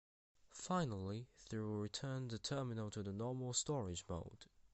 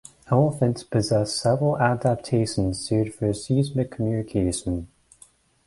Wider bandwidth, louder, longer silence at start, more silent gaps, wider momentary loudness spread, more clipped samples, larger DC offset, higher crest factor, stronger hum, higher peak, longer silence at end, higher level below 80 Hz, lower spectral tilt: second, 8.4 kHz vs 11.5 kHz; second, -44 LUFS vs -24 LUFS; first, 0.45 s vs 0.3 s; neither; first, 10 LU vs 5 LU; neither; neither; about the same, 18 dB vs 18 dB; neither; second, -26 dBFS vs -6 dBFS; second, 0.05 s vs 0.8 s; second, -64 dBFS vs -46 dBFS; about the same, -5 dB/octave vs -6 dB/octave